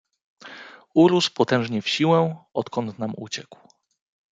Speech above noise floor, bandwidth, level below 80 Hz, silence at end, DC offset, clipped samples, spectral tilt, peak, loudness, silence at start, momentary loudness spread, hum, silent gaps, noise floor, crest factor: 22 dB; 9.2 kHz; -68 dBFS; 0.9 s; under 0.1%; under 0.1%; -5.5 dB/octave; -4 dBFS; -22 LUFS; 0.45 s; 22 LU; none; none; -43 dBFS; 18 dB